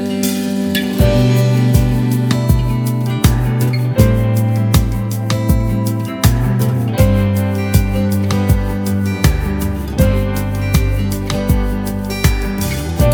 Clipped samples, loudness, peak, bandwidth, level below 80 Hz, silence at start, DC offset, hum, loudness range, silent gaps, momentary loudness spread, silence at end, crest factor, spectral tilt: under 0.1%; -15 LUFS; 0 dBFS; over 20 kHz; -22 dBFS; 0 s; under 0.1%; none; 3 LU; none; 6 LU; 0 s; 14 dB; -6.5 dB/octave